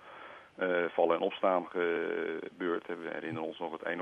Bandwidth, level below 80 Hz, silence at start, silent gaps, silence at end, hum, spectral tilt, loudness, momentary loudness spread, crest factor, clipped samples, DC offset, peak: 6.4 kHz; -82 dBFS; 0 s; none; 0 s; none; -7 dB/octave; -33 LUFS; 10 LU; 20 dB; under 0.1%; under 0.1%; -14 dBFS